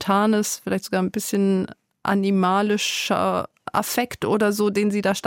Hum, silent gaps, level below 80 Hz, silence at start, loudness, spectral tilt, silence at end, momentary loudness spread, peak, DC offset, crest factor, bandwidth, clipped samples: none; none; -60 dBFS; 0 s; -22 LUFS; -4.5 dB/octave; 0 s; 6 LU; -8 dBFS; under 0.1%; 14 dB; 17 kHz; under 0.1%